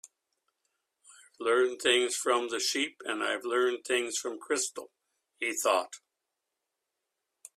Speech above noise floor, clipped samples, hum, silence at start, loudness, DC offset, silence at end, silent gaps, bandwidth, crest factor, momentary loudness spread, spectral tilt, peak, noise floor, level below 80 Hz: 56 dB; under 0.1%; none; 1.1 s; -29 LUFS; under 0.1%; 1.6 s; none; 14.5 kHz; 22 dB; 9 LU; 0 dB/octave; -10 dBFS; -86 dBFS; -80 dBFS